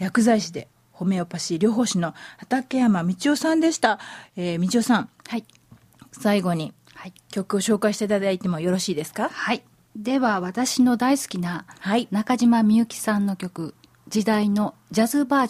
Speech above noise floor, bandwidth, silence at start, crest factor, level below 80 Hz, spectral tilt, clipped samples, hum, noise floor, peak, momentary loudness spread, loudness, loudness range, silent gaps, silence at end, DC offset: 29 dB; 15.5 kHz; 0 s; 16 dB; -64 dBFS; -5 dB/octave; under 0.1%; none; -51 dBFS; -6 dBFS; 13 LU; -23 LUFS; 4 LU; none; 0 s; under 0.1%